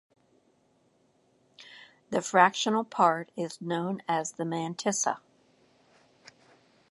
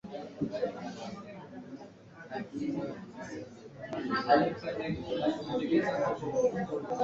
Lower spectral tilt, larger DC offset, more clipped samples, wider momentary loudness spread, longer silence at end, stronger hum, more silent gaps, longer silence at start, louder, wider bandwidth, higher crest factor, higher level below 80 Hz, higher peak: second, -3.5 dB/octave vs -6.5 dB/octave; neither; neither; second, 15 LU vs 19 LU; first, 1.7 s vs 0 s; neither; neither; first, 1.6 s vs 0.05 s; first, -28 LUFS vs -33 LUFS; first, 11.5 kHz vs 7.8 kHz; about the same, 26 dB vs 22 dB; second, -80 dBFS vs -64 dBFS; first, -4 dBFS vs -12 dBFS